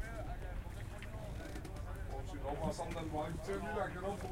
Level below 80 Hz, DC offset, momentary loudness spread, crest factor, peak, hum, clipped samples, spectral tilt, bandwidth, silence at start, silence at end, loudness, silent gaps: -48 dBFS; under 0.1%; 7 LU; 16 dB; -26 dBFS; none; under 0.1%; -6 dB/octave; 16 kHz; 0 s; 0 s; -43 LUFS; none